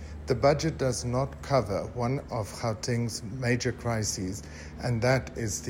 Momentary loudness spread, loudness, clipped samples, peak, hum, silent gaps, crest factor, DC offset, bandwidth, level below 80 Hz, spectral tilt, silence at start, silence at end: 8 LU; -29 LUFS; under 0.1%; -10 dBFS; none; none; 20 dB; under 0.1%; 16 kHz; -46 dBFS; -5 dB/octave; 0 s; 0 s